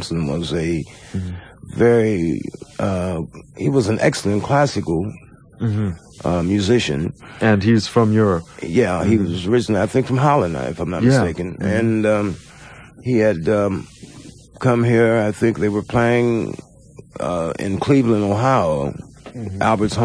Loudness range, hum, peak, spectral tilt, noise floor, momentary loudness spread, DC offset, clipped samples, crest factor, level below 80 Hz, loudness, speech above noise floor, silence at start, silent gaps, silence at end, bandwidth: 3 LU; none; -2 dBFS; -6.5 dB/octave; -41 dBFS; 13 LU; under 0.1%; under 0.1%; 16 dB; -44 dBFS; -19 LUFS; 23 dB; 0 s; none; 0 s; 11 kHz